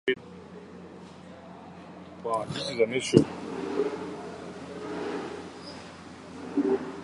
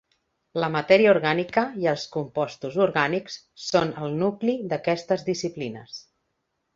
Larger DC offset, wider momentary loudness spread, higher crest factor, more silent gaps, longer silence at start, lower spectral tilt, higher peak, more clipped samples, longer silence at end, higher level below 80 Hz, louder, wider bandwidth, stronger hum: neither; first, 21 LU vs 15 LU; first, 30 dB vs 22 dB; neither; second, 0.05 s vs 0.55 s; about the same, -5.5 dB/octave vs -5.5 dB/octave; about the same, -2 dBFS vs -4 dBFS; neither; second, 0 s vs 0.75 s; about the same, -60 dBFS vs -64 dBFS; second, -30 LUFS vs -24 LUFS; first, 11.5 kHz vs 7.6 kHz; neither